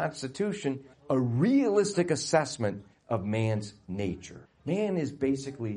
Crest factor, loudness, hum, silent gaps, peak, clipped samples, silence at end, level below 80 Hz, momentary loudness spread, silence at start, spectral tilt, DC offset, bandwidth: 18 dB; -29 LUFS; none; none; -10 dBFS; under 0.1%; 0 s; -62 dBFS; 13 LU; 0 s; -6 dB/octave; under 0.1%; 10.5 kHz